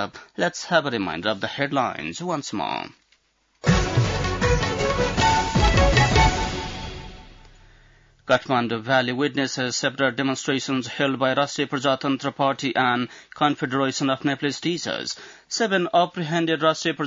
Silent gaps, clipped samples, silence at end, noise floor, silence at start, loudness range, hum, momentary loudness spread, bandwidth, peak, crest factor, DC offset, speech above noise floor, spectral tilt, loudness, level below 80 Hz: none; under 0.1%; 0 s; -65 dBFS; 0 s; 5 LU; none; 9 LU; 7.8 kHz; -6 dBFS; 18 dB; under 0.1%; 41 dB; -4.5 dB/octave; -23 LUFS; -34 dBFS